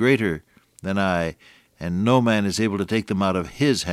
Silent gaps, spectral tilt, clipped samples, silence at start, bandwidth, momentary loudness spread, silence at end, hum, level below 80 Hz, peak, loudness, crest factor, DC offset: none; -5.5 dB/octave; under 0.1%; 0 s; 15 kHz; 11 LU; 0 s; none; -50 dBFS; -6 dBFS; -22 LUFS; 16 dB; under 0.1%